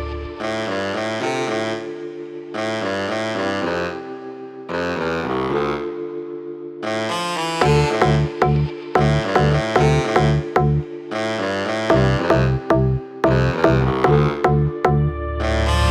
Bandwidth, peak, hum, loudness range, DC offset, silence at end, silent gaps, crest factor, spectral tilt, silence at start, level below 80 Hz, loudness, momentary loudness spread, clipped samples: 12 kHz; -2 dBFS; none; 7 LU; under 0.1%; 0 s; none; 18 dB; -6.5 dB/octave; 0 s; -32 dBFS; -20 LUFS; 12 LU; under 0.1%